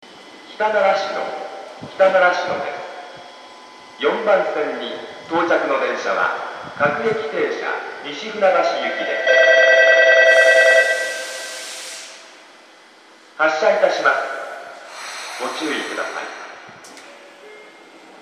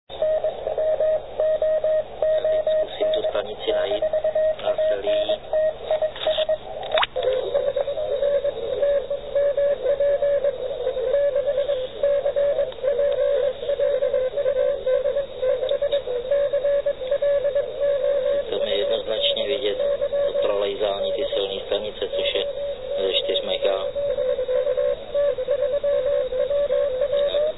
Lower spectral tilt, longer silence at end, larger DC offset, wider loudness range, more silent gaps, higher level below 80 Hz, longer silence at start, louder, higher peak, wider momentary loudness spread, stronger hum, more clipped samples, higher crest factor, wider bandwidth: second, -2.5 dB/octave vs -6.5 dB/octave; first, 0.55 s vs 0 s; second, under 0.1% vs 0.8%; first, 10 LU vs 1 LU; neither; second, -72 dBFS vs -48 dBFS; about the same, 0.05 s vs 0.05 s; first, -17 LUFS vs -23 LUFS; first, 0 dBFS vs -6 dBFS; first, 22 LU vs 4 LU; neither; neither; about the same, 18 dB vs 16 dB; first, 14 kHz vs 4.1 kHz